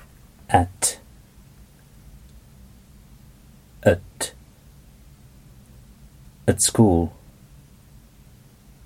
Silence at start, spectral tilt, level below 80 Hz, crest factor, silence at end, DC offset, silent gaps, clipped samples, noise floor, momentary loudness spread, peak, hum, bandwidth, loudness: 0.5 s; -4.5 dB/octave; -46 dBFS; 24 dB; 1.75 s; under 0.1%; none; under 0.1%; -50 dBFS; 14 LU; -2 dBFS; none; 17 kHz; -21 LUFS